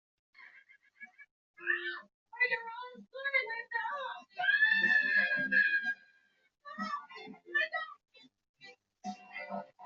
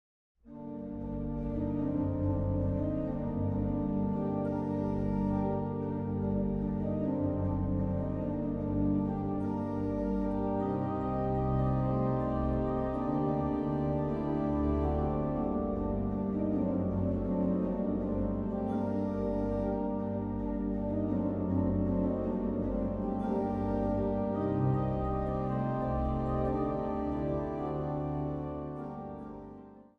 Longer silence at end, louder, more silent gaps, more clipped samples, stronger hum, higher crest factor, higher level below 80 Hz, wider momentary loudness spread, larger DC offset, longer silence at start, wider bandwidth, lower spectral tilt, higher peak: second, 0 s vs 0.15 s; about the same, -31 LUFS vs -33 LUFS; first, 1.31-1.54 s, 2.14-2.26 s, 8.49-8.54 s vs none; neither; neither; about the same, 18 dB vs 14 dB; second, -86 dBFS vs -44 dBFS; first, 21 LU vs 4 LU; neither; about the same, 0.4 s vs 0.45 s; first, 7.2 kHz vs 5 kHz; second, 0.5 dB/octave vs -11.5 dB/octave; about the same, -16 dBFS vs -18 dBFS